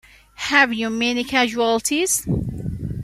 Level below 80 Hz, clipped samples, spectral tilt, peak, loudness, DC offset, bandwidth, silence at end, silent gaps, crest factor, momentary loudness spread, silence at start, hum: -40 dBFS; under 0.1%; -3.5 dB/octave; 0 dBFS; -20 LUFS; under 0.1%; 15.5 kHz; 0 s; none; 20 dB; 12 LU; 0.4 s; none